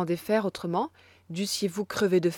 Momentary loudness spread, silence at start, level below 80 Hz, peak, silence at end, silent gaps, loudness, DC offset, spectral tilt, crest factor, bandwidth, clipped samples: 9 LU; 0 s; -66 dBFS; -12 dBFS; 0 s; none; -28 LUFS; under 0.1%; -5 dB/octave; 16 dB; 18 kHz; under 0.1%